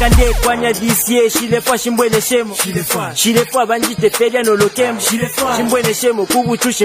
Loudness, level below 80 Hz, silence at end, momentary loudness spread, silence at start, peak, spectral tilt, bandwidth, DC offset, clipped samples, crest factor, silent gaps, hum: -14 LUFS; -24 dBFS; 0 s; 3 LU; 0 s; 0 dBFS; -3.5 dB/octave; 16 kHz; under 0.1%; under 0.1%; 14 dB; none; none